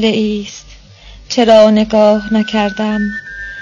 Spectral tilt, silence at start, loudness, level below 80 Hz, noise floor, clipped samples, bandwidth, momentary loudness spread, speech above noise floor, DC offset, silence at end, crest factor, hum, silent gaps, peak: -5.5 dB/octave; 0 s; -12 LUFS; -40 dBFS; -38 dBFS; 0.3%; 7.4 kHz; 17 LU; 26 dB; under 0.1%; 0 s; 12 dB; none; none; 0 dBFS